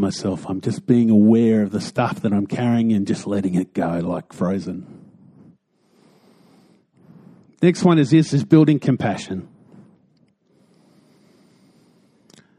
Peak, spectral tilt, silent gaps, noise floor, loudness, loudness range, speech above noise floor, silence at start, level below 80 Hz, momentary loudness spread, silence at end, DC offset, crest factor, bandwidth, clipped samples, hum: 0 dBFS; -7.5 dB/octave; none; -60 dBFS; -19 LUFS; 12 LU; 42 dB; 0 s; -60 dBFS; 12 LU; 3.15 s; under 0.1%; 20 dB; 11 kHz; under 0.1%; none